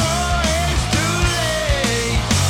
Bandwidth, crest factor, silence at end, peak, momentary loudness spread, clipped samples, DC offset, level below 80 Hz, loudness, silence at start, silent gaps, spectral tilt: 17.5 kHz; 14 dB; 0 s; -4 dBFS; 1 LU; under 0.1%; under 0.1%; -24 dBFS; -18 LUFS; 0 s; none; -3.5 dB/octave